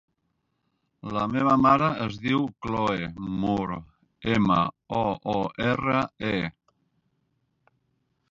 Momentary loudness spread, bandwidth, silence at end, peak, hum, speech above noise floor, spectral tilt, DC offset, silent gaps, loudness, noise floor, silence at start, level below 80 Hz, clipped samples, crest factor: 12 LU; 7.6 kHz; 1.8 s; -6 dBFS; none; 51 dB; -7.5 dB/octave; under 0.1%; none; -25 LUFS; -76 dBFS; 1.05 s; -52 dBFS; under 0.1%; 20 dB